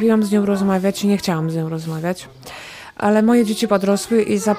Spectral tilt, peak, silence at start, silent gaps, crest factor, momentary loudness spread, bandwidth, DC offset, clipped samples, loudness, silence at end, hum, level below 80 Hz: -6 dB/octave; -4 dBFS; 0 s; none; 14 dB; 18 LU; 16 kHz; under 0.1%; under 0.1%; -18 LUFS; 0 s; none; -54 dBFS